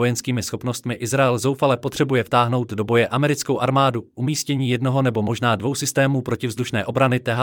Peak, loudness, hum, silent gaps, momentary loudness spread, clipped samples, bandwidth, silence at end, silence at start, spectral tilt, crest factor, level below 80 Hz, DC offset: -6 dBFS; -21 LUFS; none; none; 6 LU; under 0.1%; 18.5 kHz; 0 s; 0 s; -5.5 dB/octave; 16 dB; -58 dBFS; under 0.1%